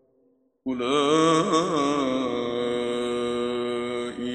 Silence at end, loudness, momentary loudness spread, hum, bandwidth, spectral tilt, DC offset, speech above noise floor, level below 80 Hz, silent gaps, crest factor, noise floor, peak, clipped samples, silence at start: 0 s; -25 LUFS; 9 LU; none; 10.5 kHz; -4.5 dB/octave; under 0.1%; 43 dB; -60 dBFS; none; 16 dB; -65 dBFS; -8 dBFS; under 0.1%; 0.65 s